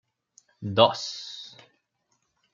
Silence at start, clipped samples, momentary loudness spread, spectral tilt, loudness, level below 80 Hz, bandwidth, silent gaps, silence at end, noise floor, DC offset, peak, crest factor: 0.6 s; under 0.1%; 20 LU; -4.5 dB/octave; -24 LUFS; -70 dBFS; 7.6 kHz; none; 1.05 s; -74 dBFS; under 0.1%; -2 dBFS; 28 dB